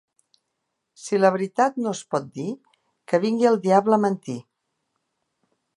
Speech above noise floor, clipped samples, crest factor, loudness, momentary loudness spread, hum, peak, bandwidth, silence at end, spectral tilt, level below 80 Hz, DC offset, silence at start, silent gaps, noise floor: 57 dB; under 0.1%; 20 dB; -22 LUFS; 16 LU; none; -4 dBFS; 11.5 kHz; 1.35 s; -6 dB/octave; -76 dBFS; under 0.1%; 1 s; none; -79 dBFS